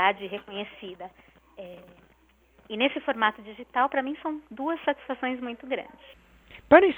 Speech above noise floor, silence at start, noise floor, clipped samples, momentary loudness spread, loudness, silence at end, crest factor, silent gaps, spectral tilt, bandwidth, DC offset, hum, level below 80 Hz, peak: 35 dB; 0 s; -62 dBFS; under 0.1%; 19 LU; -28 LUFS; 0 s; 24 dB; none; -6.5 dB/octave; 4.2 kHz; under 0.1%; none; -62 dBFS; -2 dBFS